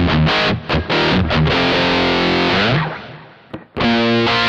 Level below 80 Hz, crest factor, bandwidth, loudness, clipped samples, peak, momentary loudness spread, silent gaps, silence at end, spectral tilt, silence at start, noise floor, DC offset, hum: -32 dBFS; 12 dB; 8.2 kHz; -15 LUFS; under 0.1%; -4 dBFS; 16 LU; none; 0 s; -6 dB/octave; 0 s; -37 dBFS; under 0.1%; none